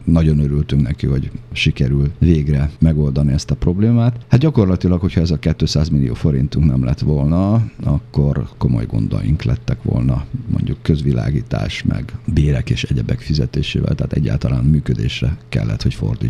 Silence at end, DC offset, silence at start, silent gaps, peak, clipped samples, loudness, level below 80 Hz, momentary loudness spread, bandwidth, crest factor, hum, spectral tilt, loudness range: 0 s; under 0.1%; 0 s; none; 0 dBFS; under 0.1%; -17 LUFS; -26 dBFS; 6 LU; 9.4 kHz; 16 dB; none; -7.5 dB/octave; 3 LU